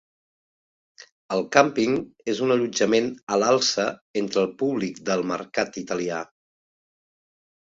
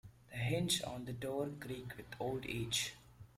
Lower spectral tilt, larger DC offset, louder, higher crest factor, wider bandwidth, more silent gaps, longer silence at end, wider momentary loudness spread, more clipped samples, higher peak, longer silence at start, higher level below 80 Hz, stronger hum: about the same, -4 dB/octave vs -4 dB/octave; neither; first, -24 LUFS vs -40 LUFS; about the same, 24 dB vs 20 dB; second, 7.8 kHz vs 16 kHz; first, 3.23-3.27 s, 4.01-4.14 s vs none; first, 1.5 s vs 0.1 s; second, 9 LU vs 12 LU; neither; first, -2 dBFS vs -22 dBFS; first, 1.3 s vs 0.05 s; about the same, -66 dBFS vs -64 dBFS; neither